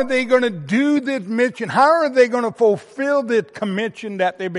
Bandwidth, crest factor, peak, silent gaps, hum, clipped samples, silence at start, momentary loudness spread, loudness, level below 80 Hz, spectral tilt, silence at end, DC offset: 11.5 kHz; 16 dB; -2 dBFS; none; none; under 0.1%; 0 s; 8 LU; -18 LUFS; -68 dBFS; -5.5 dB/octave; 0 s; under 0.1%